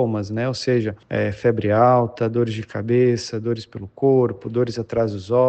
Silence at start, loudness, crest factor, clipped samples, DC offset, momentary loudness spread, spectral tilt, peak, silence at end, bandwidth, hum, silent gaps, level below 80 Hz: 0 s; -21 LUFS; 16 dB; under 0.1%; under 0.1%; 9 LU; -7 dB/octave; -4 dBFS; 0 s; 8.6 kHz; none; none; -54 dBFS